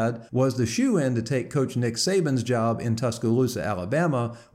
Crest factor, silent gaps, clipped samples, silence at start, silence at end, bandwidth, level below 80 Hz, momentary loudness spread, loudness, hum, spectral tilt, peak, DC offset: 14 dB; none; under 0.1%; 0 s; 0.1 s; 15.5 kHz; -58 dBFS; 4 LU; -25 LUFS; none; -6 dB/octave; -10 dBFS; under 0.1%